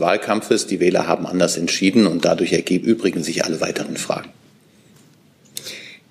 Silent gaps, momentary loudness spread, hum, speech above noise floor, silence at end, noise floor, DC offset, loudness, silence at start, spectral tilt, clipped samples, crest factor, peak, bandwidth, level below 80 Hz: none; 15 LU; none; 33 dB; 0.15 s; -52 dBFS; under 0.1%; -19 LUFS; 0 s; -4.5 dB/octave; under 0.1%; 18 dB; -2 dBFS; 15.5 kHz; -62 dBFS